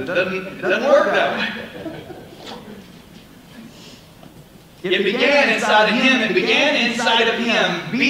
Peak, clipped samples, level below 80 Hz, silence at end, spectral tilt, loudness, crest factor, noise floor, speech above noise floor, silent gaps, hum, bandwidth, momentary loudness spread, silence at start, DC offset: -2 dBFS; under 0.1%; -56 dBFS; 0 s; -3.5 dB/octave; -16 LUFS; 16 dB; -44 dBFS; 27 dB; none; none; 16 kHz; 21 LU; 0 s; under 0.1%